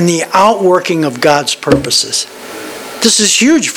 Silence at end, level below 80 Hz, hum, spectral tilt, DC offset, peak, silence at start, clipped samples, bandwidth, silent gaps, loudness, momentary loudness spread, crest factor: 0 s; -44 dBFS; none; -3 dB/octave; under 0.1%; 0 dBFS; 0 s; 0.3%; over 20 kHz; none; -10 LUFS; 16 LU; 12 dB